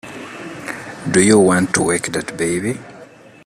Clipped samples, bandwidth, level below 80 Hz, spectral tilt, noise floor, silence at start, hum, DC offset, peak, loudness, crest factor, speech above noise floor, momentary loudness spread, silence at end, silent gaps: under 0.1%; 14.5 kHz; -52 dBFS; -4.5 dB/octave; -41 dBFS; 0.05 s; none; under 0.1%; 0 dBFS; -16 LUFS; 18 dB; 26 dB; 19 LU; 0.4 s; none